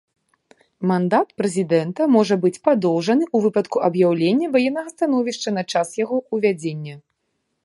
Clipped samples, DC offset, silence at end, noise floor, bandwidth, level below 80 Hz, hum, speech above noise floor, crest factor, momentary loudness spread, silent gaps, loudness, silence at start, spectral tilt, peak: under 0.1%; under 0.1%; 0.65 s; -73 dBFS; 11.5 kHz; -70 dBFS; none; 54 dB; 18 dB; 6 LU; none; -20 LUFS; 0.8 s; -6 dB/octave; -2 dBFS